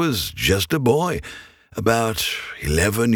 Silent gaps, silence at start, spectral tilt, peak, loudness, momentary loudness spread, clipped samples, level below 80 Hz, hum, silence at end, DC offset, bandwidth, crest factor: none; 0 s; -4.5 dB/octave; -2 dBFS; -21 LUFS; 12 LU; under 0.1%; -38 dBFS; none; 0 s; under 0.1%; over 20 kHz; 18 dB